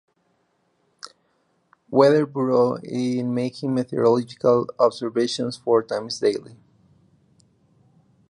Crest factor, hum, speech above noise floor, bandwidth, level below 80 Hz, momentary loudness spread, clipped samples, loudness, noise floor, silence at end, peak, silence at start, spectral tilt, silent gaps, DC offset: 20 dB; none; 47 dB; 11 kHz; -70 dBFS; 10 LU; under 0.1%; -22 LUFS; -68 dBFS; 1.75 s; -2 dBFS; 1.05 s; -6 dB/octave; none; under 0.1%